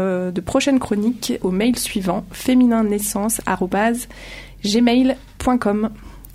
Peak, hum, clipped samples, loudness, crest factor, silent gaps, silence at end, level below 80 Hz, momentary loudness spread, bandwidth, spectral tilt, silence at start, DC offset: -2 dBFS; none; under 0.1%; -19 LUFS; 16 dB; none; 0 s; -42 dBFS; 9 LU; 16 kHz; -4.5 dB/octave; 0 s; under 0.1%